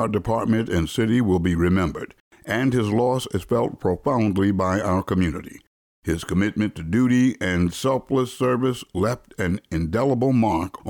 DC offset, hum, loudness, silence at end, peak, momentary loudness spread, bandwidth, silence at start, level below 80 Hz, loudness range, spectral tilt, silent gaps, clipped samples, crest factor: under 0.1%; none; -22 LUFS; 0 s; -10 dBFS; 7 LU; 18.5 kHz; 0 s; -42 dBFS; 1 LU; -7 dB/octave; 2.20-2.31 s, 5.67-6.02 s; under 0.1%; 12 dB